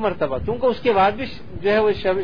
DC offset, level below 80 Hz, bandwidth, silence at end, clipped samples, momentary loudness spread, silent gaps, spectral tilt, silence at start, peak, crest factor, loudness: 2%; -42 dBFS; 5.2 kHz; 0 s; under 0.1%; 9 LU; none; -7.5 dB/octave; 0 s; -4 dBFS; 16 dB; -20 LUFS